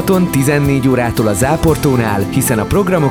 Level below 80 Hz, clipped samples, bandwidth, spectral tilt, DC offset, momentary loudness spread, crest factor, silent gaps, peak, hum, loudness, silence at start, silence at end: -32 dBFS; under 0.1%; 19.5 kHz; -6 dB/octave; under 0.1%; 2 LU; 12 dB; none; 0 dBFS; none; -13 LUFS; 0 s; 0 s